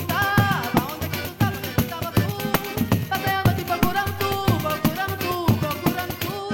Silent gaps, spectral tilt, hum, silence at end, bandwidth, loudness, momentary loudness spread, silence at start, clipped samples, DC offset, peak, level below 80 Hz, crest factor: none; -5.5 dB/octave; none; 0 s; 17.5 kHz; -23 LUFS; 5 LU; 0 s; under 0.1%; under 0.1%; -8 dBFS; -42 dBFS; 14 dB